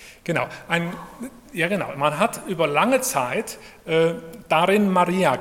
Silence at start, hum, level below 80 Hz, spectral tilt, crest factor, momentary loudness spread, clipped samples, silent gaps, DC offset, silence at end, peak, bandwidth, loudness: 0 s; none; -58 dBFS; -4.5 dB/octave; 20 dB; 16 LU; under 0.1%; none; under 0.1%; 0 s; -2 dBFS; 17 kHz; -22 LUFS